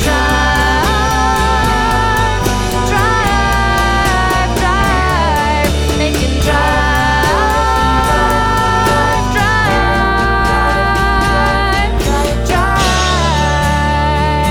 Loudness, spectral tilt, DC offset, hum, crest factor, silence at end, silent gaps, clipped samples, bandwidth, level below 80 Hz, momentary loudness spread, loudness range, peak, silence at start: -12 LUFS; -4.5 dB/octave; under 0.1%; none; 12 dB; 0 s; none; under 0.1%; 18.5 kHz; -18 dBFS; 2 LU; 1 LU; 0 dBFS; 0 s